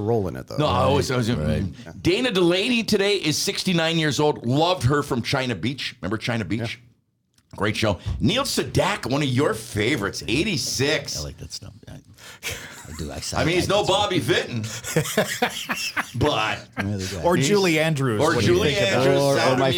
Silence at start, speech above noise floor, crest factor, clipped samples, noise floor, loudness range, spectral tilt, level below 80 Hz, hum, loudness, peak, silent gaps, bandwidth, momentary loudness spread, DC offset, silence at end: 0 s; 43 dB; 16 dB; under 0.1%; -65 dBFS; 5 LU; -4.5 dB/octave; -46 dBFS; none; -22 LUFS; -6 dBFS; none; 19.5 kHz; 11 LU; under 0.1%; 0 s